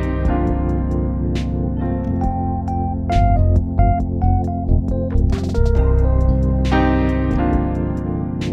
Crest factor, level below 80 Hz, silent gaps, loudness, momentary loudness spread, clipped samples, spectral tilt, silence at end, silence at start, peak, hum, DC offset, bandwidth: 16 dB; -20 dBFS; none; -19 LUFS; 5 LU; under 0.1%; -9 dB/octave; 0 s; 0 s; -2 dBFS; none; under 0.1%; 7.6 kHz